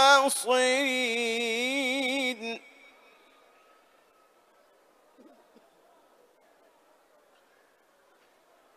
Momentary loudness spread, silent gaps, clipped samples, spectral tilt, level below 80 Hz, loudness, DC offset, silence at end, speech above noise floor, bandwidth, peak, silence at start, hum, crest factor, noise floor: 11 LU; none; under 0.1%; -0.5 dB/octave; -88 dBFS; -26 LUFS; under 0.1%; 6.2 s; 37 dB; 15 kHz; -6 dBFS; 0 s; none; 24 dB; -64 dBFS